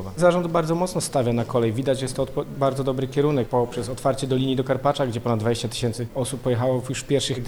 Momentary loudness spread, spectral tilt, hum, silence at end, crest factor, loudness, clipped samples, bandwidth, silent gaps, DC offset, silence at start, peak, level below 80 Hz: 5 LU; -6 dB/octave; none; 0 s; 18 dB; -23 LUFS; under 0.1%; over 20 kHz; none; under 0.1%; 0 s; -6 dBFS; -46 dBFS